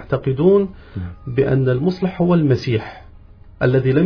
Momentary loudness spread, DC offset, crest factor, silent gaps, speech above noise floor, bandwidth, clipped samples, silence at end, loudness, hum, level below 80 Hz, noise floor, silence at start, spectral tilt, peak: 14 LU; under 0.1%; 14 dB; none; 25 dB; 5.4 kHz; under 0.1%; 0 s; -18 LUFS; none; -42 dBFS; -42 dBFS; 0 s; -9.5 dB/octave; -4 dBFS